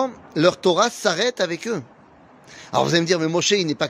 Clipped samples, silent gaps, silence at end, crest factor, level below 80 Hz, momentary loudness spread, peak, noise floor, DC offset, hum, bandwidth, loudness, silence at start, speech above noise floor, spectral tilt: under 0.1%; none; 0 s; 18 dB; -64 dBFS; 8 LU; -2 dBFS; -49 dBFS; under 0.1%; none; 15.5 kHz; -20 LUFS; 0 s; 29 dB; -4 dB/octave